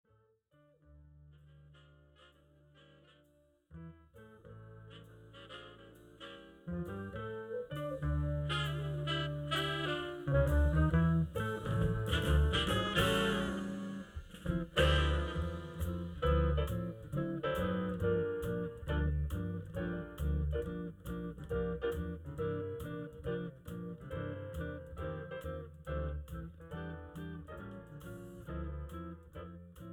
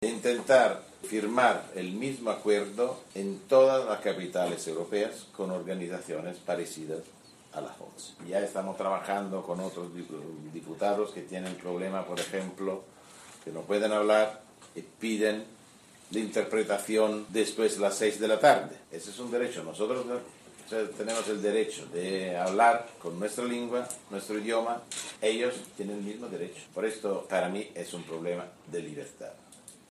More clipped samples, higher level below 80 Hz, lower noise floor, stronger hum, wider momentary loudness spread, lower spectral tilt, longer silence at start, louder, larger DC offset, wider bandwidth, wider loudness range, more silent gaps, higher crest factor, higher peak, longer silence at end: neither; first, -42 dBFS vs -76 dBFS; first, -71 dBFS vs -56 dBFS; neither; first, 20 LU vs 17 LU; first, -6.5 dB/octave vs -4 dB/octave; first, 0.9 s vs 0 s; second, -37 LUFS vs -30 LUFS; neither; first, 15.5 kHz vs 14 kHz; first, 14 LU vs 7 LU; neither; about the same, 20 dB vs 22 dB; second, -18 dBFS vs -8 dBFS; second, 0 s vs 0.15 s